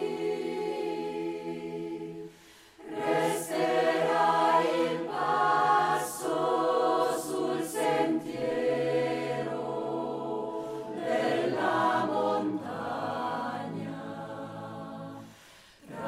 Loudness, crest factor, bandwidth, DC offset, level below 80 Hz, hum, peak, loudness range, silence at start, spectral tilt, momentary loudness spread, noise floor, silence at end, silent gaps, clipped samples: -29 LUFS; 16 dB; 16 kHz; under 0.1%; -72 dBFS; none; -12 dBFS; 7 LU; 0 s; -5 dB/octave; 15 LU; -55 dBFS; 0 s; none; under 0.1%